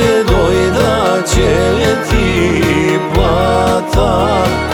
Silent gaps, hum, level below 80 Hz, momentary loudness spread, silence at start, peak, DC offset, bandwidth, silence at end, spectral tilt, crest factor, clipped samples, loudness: none; none; -20 dBFS; 2 LU; 0 s; 0 dBFS; under 0.1%; 19 kHz; 0 s; -5.5 dB/octave; 10 dB; under 0.1%; -12 LUFS